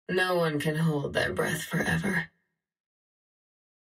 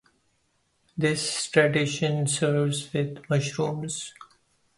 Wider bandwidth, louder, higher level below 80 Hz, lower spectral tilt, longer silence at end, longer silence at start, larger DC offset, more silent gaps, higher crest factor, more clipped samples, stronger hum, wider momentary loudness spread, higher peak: first, 16 kHz vs 11.5 kHz; about the same, -28 LUFS vs -26 LUFS; first, -56 dBFS vs -64 dBFS; about the same, -5.5 dB/octave vs -4.5 dB/octave; first, 1.6 s vs 0.55 s; second, 0.1 s vs 0.95 s; neither; neither; about the same, 18 dB vs 22 dB; neither; neither; second, 4 LU vs 11 LU; second, -14 dBFS vs -4 dBFS